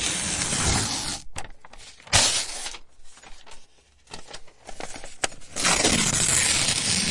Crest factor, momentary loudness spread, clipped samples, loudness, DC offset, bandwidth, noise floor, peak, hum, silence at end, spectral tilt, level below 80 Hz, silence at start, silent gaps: 22 dB; 22 LU; under 0.1%; -22 LUFS; under 0.1%; 11.5 kHz; -52 dBFS; -4 dBFS; none; 0 s; -1.5 dB/octave; -42 dBFS; 0 s; none